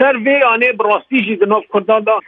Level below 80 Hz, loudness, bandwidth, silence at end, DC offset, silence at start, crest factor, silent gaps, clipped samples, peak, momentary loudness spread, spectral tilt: -68 dBFS; -13 LUFS; 4.8 kHz; 0.05 s; under 0.1%; 0 s; 12 dB; none; under 0.1%; 0 dBFS; 4 LU; -7.5 dB/octave